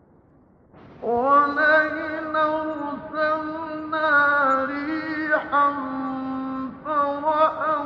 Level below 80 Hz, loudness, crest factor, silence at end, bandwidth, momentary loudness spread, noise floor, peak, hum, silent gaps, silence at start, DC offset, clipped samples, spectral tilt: -60 dBFS; -22 LUFS; 16 dB; 0 s; 7.2 kHz; 12 LU; -55 dBFS; -6 dBFS; none; none; 0.75 s; under 0.1%; under 0.1%; -6.5 dB/octave